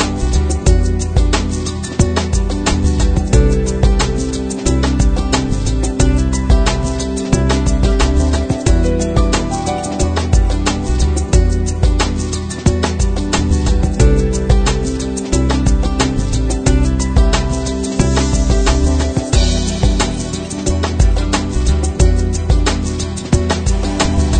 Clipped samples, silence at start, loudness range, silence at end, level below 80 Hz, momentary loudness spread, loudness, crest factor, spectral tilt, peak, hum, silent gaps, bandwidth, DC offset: under 0.1%; 0 s; 1 LU; 0 s; -16 dBFS; 5 LU; -16 LUFS; 14 dB; -5.5 dB/octave; 0 dBFS; none; none; 9.4 kHz; under 0.1%